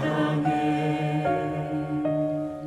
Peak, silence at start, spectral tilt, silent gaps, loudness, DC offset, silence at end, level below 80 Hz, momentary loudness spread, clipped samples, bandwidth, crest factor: -12 dBFS; 0 s; -8 dB/octave; none; -26 LUFS; under 0.1%; 0 s; -58 dBFS; 4 LU; under 0.1%; 11 kHz; 14 dB